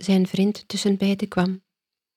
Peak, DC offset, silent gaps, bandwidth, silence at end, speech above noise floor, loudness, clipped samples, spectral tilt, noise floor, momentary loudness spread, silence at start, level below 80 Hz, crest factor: -8 dBFS; under 0.1%; none; 14 kHz; 0.6 s; 64 dB; -23 LUFS; under 0.1%; -6 dB/octave; -86 dBFS; 5 LU; 0 s; -60 dBFS; 16 dB